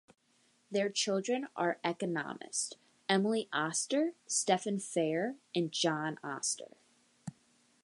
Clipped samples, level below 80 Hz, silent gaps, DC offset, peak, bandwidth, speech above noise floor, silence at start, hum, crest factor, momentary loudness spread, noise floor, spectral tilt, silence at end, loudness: under 0.1%; -86 dBFS; none; under 0.1%; -14 dBFS; 11.5 kHz; 37 dB; 0.7 s; none; 22 dB; 10 LU; -71 dBFS; -3 dB/octave; 0.5 s; -34 LUFS